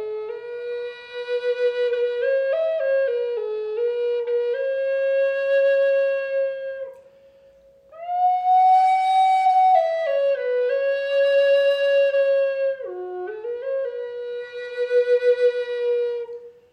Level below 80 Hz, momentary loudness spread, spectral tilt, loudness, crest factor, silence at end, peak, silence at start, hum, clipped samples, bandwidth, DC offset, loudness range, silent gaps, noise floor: -74 dBFS; 14 LU; -2.5 dB/octave; -21 LUFS; 14 dB; 0.2 s; -8 dBFS; 0 s; none; under 0.1%; 8.8 kHz; under 0.1%; 5 LU; none; -52 dBFS